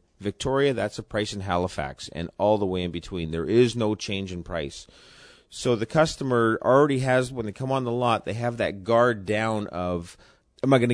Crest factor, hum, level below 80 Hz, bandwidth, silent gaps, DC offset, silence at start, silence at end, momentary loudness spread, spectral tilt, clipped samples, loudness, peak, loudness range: 18 dB; none; -50 dBFS; 10.5 kHz; none; under 0.1%; 0.2 s; 0 s; 11 LU; -6 dB/octave; under 0.1%; -25 LUFS; -6 dBFS; 3 LU